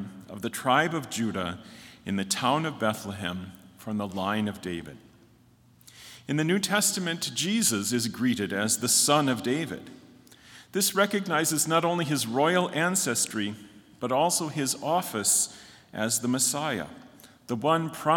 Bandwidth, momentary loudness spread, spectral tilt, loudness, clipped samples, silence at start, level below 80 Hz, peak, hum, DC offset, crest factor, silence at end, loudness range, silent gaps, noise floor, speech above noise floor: 18 kHz; 13 LU; -3 dB/octave; -26 LUFS; under 0.1%; 0 s; -70 dBFS; -8 dBFS; none; under 0.1%; 20 dB; 0 s; 5 LU; none; -59 dBFS; 32 dB